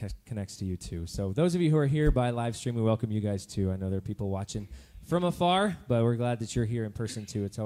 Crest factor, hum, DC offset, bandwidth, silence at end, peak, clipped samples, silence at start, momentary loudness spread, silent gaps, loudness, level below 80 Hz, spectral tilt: 18 dB; none; under 0.1%; 14.5 kHz; 0 s; -12 dBFS; under 0.1%; 0 s; 12 LU; none; -30 LUFS; -42 dBFS; -6.5 dB/octave